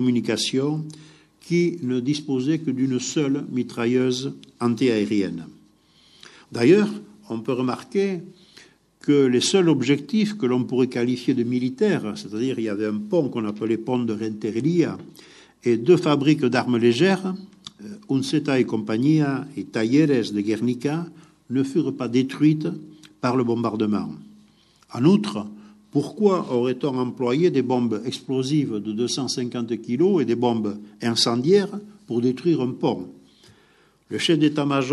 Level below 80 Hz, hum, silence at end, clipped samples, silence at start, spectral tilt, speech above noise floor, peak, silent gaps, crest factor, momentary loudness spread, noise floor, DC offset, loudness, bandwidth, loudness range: -70 dBFS; none; 0 s; under 0.1%; 0 s; -6 dB/octave; 37 dB; -4 dBFS; none; 18 dB; 12 LU; -58 dBFS; under 0.1%; -22 LUFS; 12 kHz; 3 LU